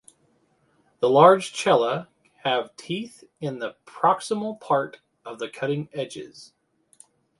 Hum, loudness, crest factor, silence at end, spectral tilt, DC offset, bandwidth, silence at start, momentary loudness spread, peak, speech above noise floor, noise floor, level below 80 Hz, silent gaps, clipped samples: none; -23 LUFS; 24 dB; 0.95 s; -5 dB/octave; under 0.1%; 11.5 kHz; 1 s; 19 LU; -2 dBFS; 42 dB; -65 dBFS; -72 dBFS; none; under 0.1%